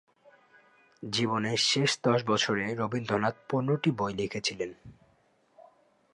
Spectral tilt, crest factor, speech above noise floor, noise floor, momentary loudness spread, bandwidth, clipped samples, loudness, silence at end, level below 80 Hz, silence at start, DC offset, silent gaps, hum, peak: -4 dB/octave; 18 dB; 38 dB; -67 dBFS; 7 LU; 11.5 kHz; under 0.1%; -29 LUFS; 0.55 s; -66 dBFS; 1 s; under 0.1%; none; none; -12 dBFS